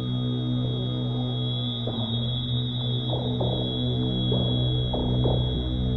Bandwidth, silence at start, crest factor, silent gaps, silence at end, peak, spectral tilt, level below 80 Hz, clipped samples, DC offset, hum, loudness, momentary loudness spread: 4.2 kHz; 0 s; 14 dB; none; 0 s; -12 dBFS; -9 dB/octave; -36 dBFS; under 0.1%; under 0.1%; none; -26 LUFS; 4 LU